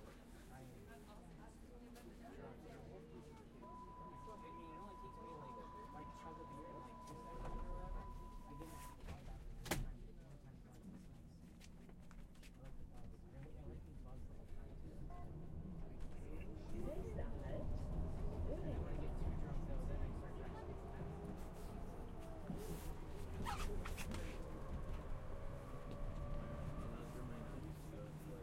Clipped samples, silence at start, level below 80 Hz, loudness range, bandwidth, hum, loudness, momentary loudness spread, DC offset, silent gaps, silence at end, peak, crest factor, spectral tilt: under 0.1%; 0 s; -52 dBFS; 10 LU; 16 kHz; none; -52 LUFS; 12 LU; under 0.1%; none; 0 s; -26 dBFS; 22 dB; -6 dB/octave